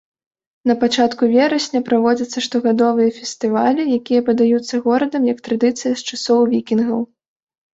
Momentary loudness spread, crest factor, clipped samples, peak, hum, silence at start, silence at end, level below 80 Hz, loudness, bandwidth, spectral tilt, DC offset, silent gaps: 6 LU; 14 dB; under 0.1%; -2 dBFS; none; 0.65 s; 0.7 s; -62 dBFS; -17 LUFS; 8 kHz; -4.5 dB/octave; under 0.1%; none